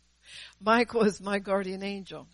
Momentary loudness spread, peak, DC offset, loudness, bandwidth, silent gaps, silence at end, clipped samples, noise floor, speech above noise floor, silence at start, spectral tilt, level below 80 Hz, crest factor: 21 LU; -10 dBFS; under 0.1%; -28 LUFS; 11.5 kHz; none; 0.1 s; under 0.1%; -50 dBFS; 22 dB; 0.3 s; -5.5 dB/octave; -62 dBFS; 18 dB